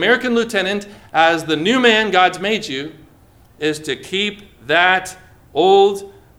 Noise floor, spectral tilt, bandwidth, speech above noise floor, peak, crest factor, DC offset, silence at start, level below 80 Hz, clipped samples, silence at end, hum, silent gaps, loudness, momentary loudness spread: -48 dBFS; -3.5 dB/octave; 15.5 kHz; 32 dB; 0 dBFS; 18 dB; under 0.1%; 0 s; -54 dBFS; under 0.1%; 0.3 s; none; none; -16 LUFS; 13 LU